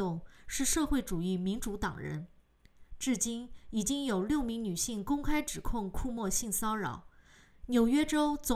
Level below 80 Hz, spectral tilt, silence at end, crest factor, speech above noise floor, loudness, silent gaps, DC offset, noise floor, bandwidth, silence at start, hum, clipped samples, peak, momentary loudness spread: -46 dBFS; -4 dB/octave; 0 s; 16 dB; 28 dB; -33 LUFS; none; under 0.1%; -60 dBFS; 16 kHz; 0 s; none; under 0.1%; -16 dBFS; 11 LU